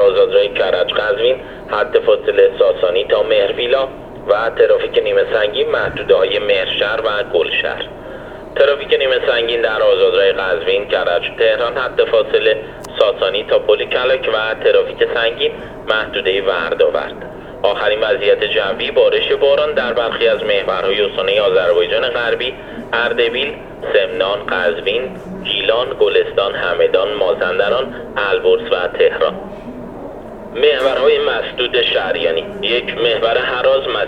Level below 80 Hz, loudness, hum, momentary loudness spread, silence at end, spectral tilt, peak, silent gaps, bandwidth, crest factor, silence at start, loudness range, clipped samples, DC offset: -44 dBFS; -15 LUFS; none; 8 LU; 0 s; -5 dB/octave; 0 dBFS; none; 6.2 kHz; 16 dB; 0 s; 2 LU; under 0.1%; under 0.1%